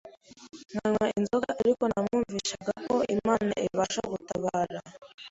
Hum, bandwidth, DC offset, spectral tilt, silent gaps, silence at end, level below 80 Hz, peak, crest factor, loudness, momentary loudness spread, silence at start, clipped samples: none; 8 kHz; under 0.1%; -5 dB/octave; 5.14-5.18 s; 0 s; -60 dBFS; -10 dBFS; 20 dB; -29 LUFS; 9 LU; 0.05 s; under 0.1%